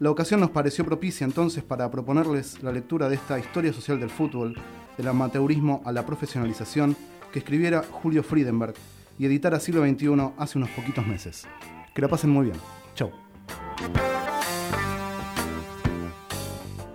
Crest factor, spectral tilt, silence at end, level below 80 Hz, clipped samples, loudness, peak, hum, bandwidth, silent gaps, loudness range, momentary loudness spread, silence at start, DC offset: 18 dB; -6.5 dB/octave; 0 s; -48 dBFS; under 0.1%; -26 LUFS; -8 dBFS; none; 16.5 kHz; none; 4 LU; 13 LU; 0 s; under 0.1%